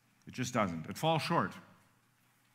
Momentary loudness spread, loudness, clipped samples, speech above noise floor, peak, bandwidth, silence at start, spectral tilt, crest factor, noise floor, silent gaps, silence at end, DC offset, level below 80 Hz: 13 LU; -34 LUFS; under 0.1%; 37 dB; -16 dBFS; 16 kHz; 0.25 s; -5 dB/octave; 22 dB; -71 dBFS; none; 0.9 s; under 0.1%; -72 dBFS